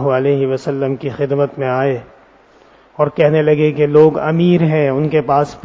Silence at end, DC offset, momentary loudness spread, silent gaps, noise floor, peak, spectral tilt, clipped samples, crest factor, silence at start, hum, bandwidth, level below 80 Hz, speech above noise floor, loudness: 0.05 s; under 0.1%; 8 LU; none; -47 dBFS; 0 dBFS; -8.5 dB/octave; under 0.1%; 14 dB; 0 s; none; 7.6 kHz; -52 dBFS; 33 dB; -14 LUFS